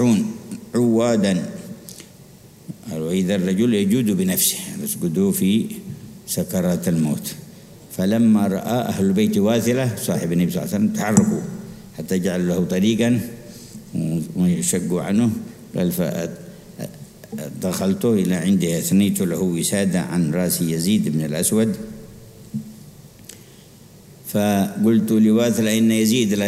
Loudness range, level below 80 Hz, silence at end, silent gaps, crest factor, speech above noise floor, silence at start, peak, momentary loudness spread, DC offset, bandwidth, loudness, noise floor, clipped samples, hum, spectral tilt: 4 LU; -54 dBFS; 0 s; none; 20 dB; 26 dB; 0 s; 0 dBFS; 18 LU; under 0.1%; 16 kHz; -20 LUFS; -45 dBFS; under 0.1%; none; -5.5 dB/octave